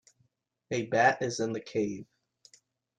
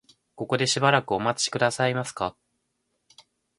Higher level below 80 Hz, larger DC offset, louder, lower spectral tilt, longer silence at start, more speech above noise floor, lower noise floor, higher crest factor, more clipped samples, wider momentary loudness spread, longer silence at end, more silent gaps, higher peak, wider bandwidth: second, -72 dBFS vs -62 dBFS; neither; second, -30 LUFS vs -24 LUFS; about the same, -4.5 dB/octave vs -3.5 dB/octave; first, 0.7 s vs 0.4 s; second, 44 dB vs 51 dB; about the same, -73 dBFS vs -76 dBFS; about the same, 22 dB vs 24 dB; neither; about the same, 11 LU vs 11 LU; second, 0.95 s vs 1.3 s; neither; second, -12 dBFS vs -4 dBFS; second, 9.8 kHz vs 11.5 kHz